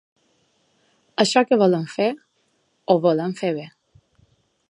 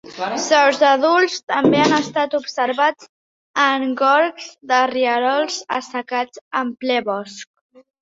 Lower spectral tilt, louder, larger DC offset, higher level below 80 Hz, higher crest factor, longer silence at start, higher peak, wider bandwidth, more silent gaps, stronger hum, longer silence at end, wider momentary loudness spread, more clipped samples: first, -5 dB/octave vs -3.5 dB/octave; about the same, -20 LUFS vs -18 LUFS; neither; second, -72 dBFS vs -64 dBFS; about the same, 20 dB vs 18 dB; first, 1.2 s vs 0.05 s; about the same, -2 dBFS vs -2 dBFS; first, 11 kHz vs 7.8 kHz; second, none vs 1.43-1.47 s, 3.09-3.54 s, 6.41-6.51 s; neither; first, 1 s vs 0.6 s; first, 18 LU vs 10 LU; neither